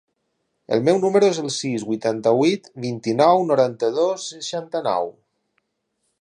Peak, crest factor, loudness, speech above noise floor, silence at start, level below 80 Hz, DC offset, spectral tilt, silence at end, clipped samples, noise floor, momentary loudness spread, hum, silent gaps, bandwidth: -2 dBFS; 18 dB; -20 LUFS; 54 dB; 0.7 s; -70 dBFS; under 0.1%; -5 dB/octave; 1.1 s; under 0.1%; -74 dBFS; 11 LU; none; none; 10.5 kHz